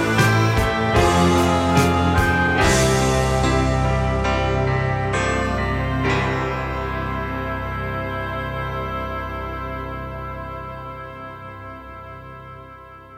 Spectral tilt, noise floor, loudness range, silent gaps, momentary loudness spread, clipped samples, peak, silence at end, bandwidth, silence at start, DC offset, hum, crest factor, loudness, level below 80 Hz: -5.5 dB/octave; -41 dBFS; 14 LU; none; 19 LU; under 0.1%; -4 dBFS; 0 s; 16 kHz; 0 s; under 0.1%; none; 16 dB; -20 LUFS; -30 dBFS